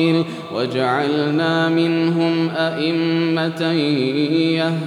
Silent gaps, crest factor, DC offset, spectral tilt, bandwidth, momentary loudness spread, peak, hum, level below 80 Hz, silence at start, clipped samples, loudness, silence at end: none; 12 dB; under 0.1%; -7 dB/octave; 11 kHz; 3 LU; -6 dBFS; none; -76 dBFS; 0 s; under 0.1%; -18 LUFS; 0 s